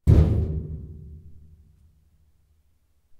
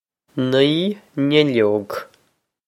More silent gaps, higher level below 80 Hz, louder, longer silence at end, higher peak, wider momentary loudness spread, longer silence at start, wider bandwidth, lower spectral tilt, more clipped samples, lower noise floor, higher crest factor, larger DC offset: neither; first, -32 dBFS vs -64 dBFS; second, -24 LUFS vs -18 LUFS; first, 1.85 s vs 0.65 s; second, -4 dBFS vs 0 dBFS; first, 27 LU vs 15 LU; second, 0.05 s vs 0.35 s; second, 5 kHz vs 14.5 kHz; first, -10 dB/octave vs -6.5 dB/octave; neither; about the same, -64 dBFS vs -65 dBFS; about the same, 20 dB vs 18 dB; neither